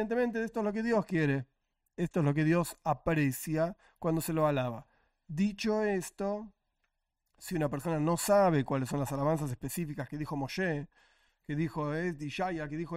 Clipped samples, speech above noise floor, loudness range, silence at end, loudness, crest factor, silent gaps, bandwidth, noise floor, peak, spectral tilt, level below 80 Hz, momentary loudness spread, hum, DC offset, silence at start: under 0.1%; 50 dB; 4 LU; 0 s; -32 LUFS; 16 dB; none; 16 kHz; -81 dBFS; -16 dBFS; -6.5 dB/octave; -58 dBFS; 10 LU; none; under 0.1%; 0 s